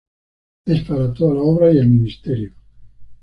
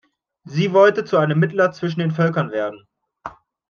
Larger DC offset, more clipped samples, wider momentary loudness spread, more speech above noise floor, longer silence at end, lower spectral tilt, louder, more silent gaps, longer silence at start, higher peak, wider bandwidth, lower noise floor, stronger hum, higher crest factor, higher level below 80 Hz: neither; neither; second, 12 LU vs 23 LU; about the same, 23 dB vs 21 dB; second, 0.1 s vs 0.4 s; first, -10.5 dB/octave vs -7.5 dB/octave; first, -16 LUFS vs -19 LUFS; neither; first, 0.65 s vs 0.45 s; about the same, -2 dBFS vs -2 dBFS; second, 5.6 kHz vs 6.8 kHz; about the same, -38 dBFS vs -38 dBFS; neither; about the same, 14 dB vs 18 dB; first, -42 dBFS vs -64 dBFS